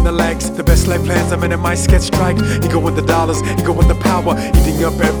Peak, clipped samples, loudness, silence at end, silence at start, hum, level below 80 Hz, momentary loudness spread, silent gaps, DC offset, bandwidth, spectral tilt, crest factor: 0 dBFS; under 0.1%; -14 LUFS; 0 s; 0 s; none; -18 dBFS; 3 LU; none; under 0.1%; over 20 kHz; -5.5 dB/octave; 12 dB